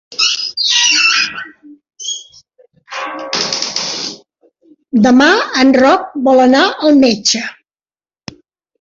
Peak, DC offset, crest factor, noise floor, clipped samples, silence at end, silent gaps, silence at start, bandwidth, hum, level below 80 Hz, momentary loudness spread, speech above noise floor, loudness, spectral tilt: 0 dBFS; under 0.1%; 14 dB; under -90 dBFS; under 0.1%; 1.3 s; none; 0.1 s; 7.8 kHz; none; -54 dBFS; 16 LU; over 79 dB; -11 LUFS; -2 dB/octave